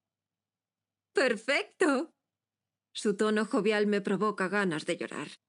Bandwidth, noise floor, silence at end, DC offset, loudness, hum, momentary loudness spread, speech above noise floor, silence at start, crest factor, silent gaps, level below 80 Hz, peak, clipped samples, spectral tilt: 11 kHz; under -90 dBFS; 0.15 s; under 0.1%; -30 LUFS; none; 8 LU; over 61 dB; 1.15 s; 18 dB; none; -86 dBFS; -14 dBFS; under 0.1%; -4.5 dB/octave